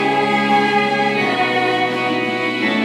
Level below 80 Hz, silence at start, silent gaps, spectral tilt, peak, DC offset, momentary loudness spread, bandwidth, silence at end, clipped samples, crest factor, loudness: -68 dBFS; 0 s; none; -5 dB/octave; -4 dBFS; under 0.1%; 4 LU; 13.5 kHz; 0 s; under 0.1%; 14 dB; -16 LUFS